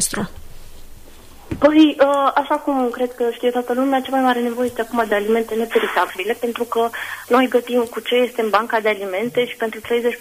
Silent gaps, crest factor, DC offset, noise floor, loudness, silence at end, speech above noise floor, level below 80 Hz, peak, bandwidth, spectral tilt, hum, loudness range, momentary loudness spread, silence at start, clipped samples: none; 16 dB; under 0.1%; -39 dBFS; -19 LUFS; 0 s; 21 dB; -46 dBFS; -4 dBFS; 15.5 kHz; -3.5 dB/octave; none; 2 LU; 7 LU; 0 s; under 0.1%